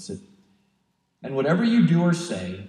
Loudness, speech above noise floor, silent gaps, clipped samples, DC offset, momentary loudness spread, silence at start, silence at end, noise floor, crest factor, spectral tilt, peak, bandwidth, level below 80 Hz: -22 LUFS; 49 dB; none; under 0.1%; under 0.1%; 20 LU; 0 s; 0 s; -71 dBFS; 16 dB; -7 dB/octave; -8 dBFS; 10.5 kHz; -70 dBFS